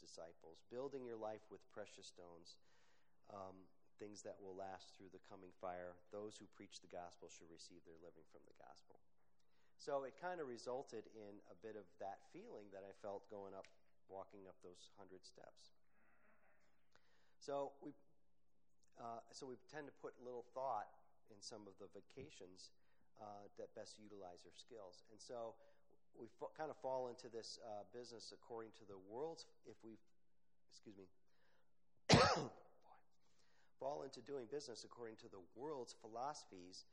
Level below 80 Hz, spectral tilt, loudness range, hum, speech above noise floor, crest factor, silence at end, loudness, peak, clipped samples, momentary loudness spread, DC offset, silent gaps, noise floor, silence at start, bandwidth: -74 dBFS; -4.5 dB/octave; 17 LU; none; 36 dB; 32 dB; 0.1 s; -49 LUFS; -20 dBFS; under 0.1%; 16 LU; under 0.1%; none; -89 dBFS; 0 s; 10 kHz